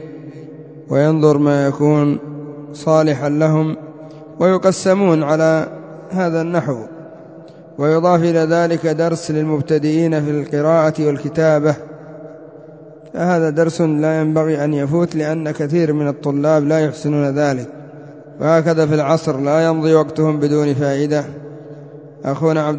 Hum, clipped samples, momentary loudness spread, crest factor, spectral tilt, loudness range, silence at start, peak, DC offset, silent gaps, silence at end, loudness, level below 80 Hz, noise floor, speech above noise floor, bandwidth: none; under 0.1%; 20 LU; 16 dB; -7.5 dB/octave; 2 LU; 0 s; 0 dBFS; under 0.1%; none; 0 s; -16 LUFS; -58 dBFS; -38 dBFS; 23 dB; 8 kHz